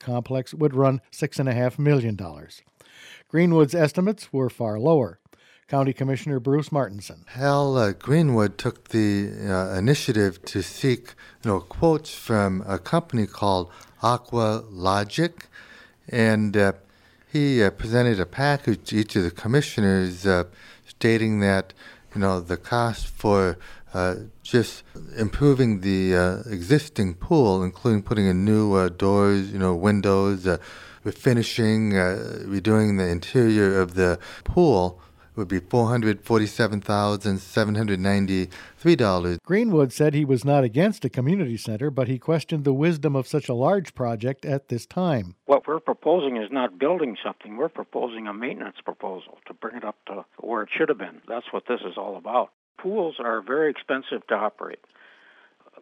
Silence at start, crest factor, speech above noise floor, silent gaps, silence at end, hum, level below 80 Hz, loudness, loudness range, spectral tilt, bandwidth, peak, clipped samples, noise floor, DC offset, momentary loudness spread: 0.05 s; 18 dB; 33 dB; 52.53-52.75 s; 1.05 s; none; -48 dBFS; -23 LUFS; 6 LU; -7 dB/octave; 16 kHz; -6 dBFS; under 0.1%; -56 dBFS; under 0.1%; 11 LU